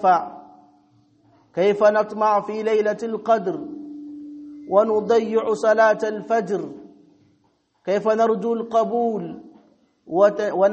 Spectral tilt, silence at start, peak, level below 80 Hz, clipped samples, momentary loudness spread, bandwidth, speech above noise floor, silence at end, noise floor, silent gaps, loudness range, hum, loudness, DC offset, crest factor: -6 dB/octave; 0 s; -4 dBFS; -70 dBFS; under 0.1%; 19 LU; 8.4 kHz; 45 dB; 0 s; -65 dBFS; none; 3 LU; none; -20 LUFS; under 0.1%; 18 dB